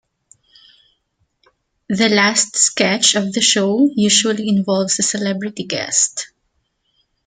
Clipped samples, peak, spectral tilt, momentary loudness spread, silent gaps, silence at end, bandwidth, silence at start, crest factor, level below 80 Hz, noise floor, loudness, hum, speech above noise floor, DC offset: under 0.1%; 0 dBFS; -2.5 dB/octave; 10 LU; none; 1 s; 9.6 kHz; 1.9 s; 18 dB; -62 dBFS; -68 dBFS; -15 LUFS; none; 52 dB; under 0.1%